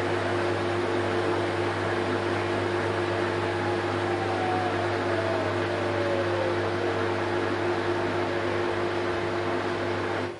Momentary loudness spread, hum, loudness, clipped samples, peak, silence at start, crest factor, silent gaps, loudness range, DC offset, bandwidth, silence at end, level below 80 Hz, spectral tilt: 2 LU; 50 Hz at -35 dBFS; -27 LUFS; under 0.1%; -14 dBFS; 0 s; 14 dB; none; 1 LU; under 0.1%; 11.5 kHz; 0 s; -60 dBFS; -6 dB/octave